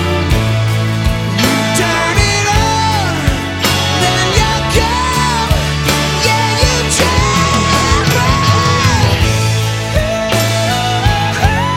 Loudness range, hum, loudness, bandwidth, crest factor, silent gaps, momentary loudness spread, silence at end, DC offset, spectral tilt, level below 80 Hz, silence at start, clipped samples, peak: 2 LU; none; -12 LUFS; 17 kHz; 12 dB; none; 4 LU; 0 s; under 0.1%; -4 dB/octave; -22 dBFS; 0 s; under 0.1%; 0 dBFS